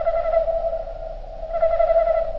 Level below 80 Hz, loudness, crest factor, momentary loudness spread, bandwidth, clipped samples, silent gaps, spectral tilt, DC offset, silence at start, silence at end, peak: -34 dBFS; -21 LUFS; 14 dB; 16 LU; 5.6 kHz; under 0.1%; none; -7 dB/octave; under 0.1%; 0 s; 0 s; -8 dBFS